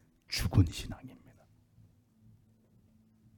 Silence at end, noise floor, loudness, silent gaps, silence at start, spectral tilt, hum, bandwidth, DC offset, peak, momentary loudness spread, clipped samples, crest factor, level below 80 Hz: 2.2 s; -65 dBFS; -32 LUFS; none; 0.3 s; -5.5 dB/octave; none; 18 kHz; under 0.1%; -12 dBFS; 20 LU; under 0.1%; 24 dB; -48 dBFS